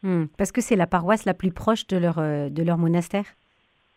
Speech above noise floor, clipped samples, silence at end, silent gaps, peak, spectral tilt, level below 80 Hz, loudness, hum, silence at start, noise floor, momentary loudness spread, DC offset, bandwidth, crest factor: 43 dB; under 0.1%; 0.65 s; none; -6 dBFS; -6.5 dB/octave; -50 dBFS; -23 LUFS; none; 0.05 s; -65 dBFS; 5 LU; under 0.1%; 14 kHz; 16 dB